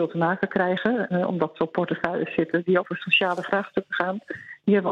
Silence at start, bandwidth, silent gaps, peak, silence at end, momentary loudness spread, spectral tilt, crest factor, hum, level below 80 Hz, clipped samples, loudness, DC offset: 0 s; 7.8 kHz; none; -4 dBFS; 0 s; 7 LU; -7.5 dB/octave; 20 dB; none; -64 dBFS; under 0.1%; -24 LUFS; under 0.1%